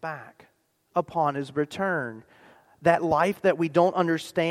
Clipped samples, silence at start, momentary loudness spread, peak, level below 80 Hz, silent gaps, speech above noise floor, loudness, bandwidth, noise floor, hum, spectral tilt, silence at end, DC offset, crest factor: under 0.1%; 0.05 s; 8 LU; -6 dBFS; -64 dBFS; none; 42 dB; -25 LUFS; 15 kHz; -67 dBFS; none; -6.5 dB/octave; 0 s; under 0.1%; 20 dB